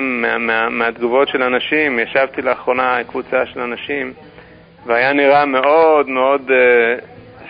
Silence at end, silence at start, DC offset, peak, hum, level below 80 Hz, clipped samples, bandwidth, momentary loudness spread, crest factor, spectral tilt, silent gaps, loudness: 0 s; 0 s; under 0.1%; -2 dBFS; none; -54 dBFS; under 0.1%; 5.2 kHz; 10 LU; 14 dB; -9.5 dB/octave; none; -15 LUFS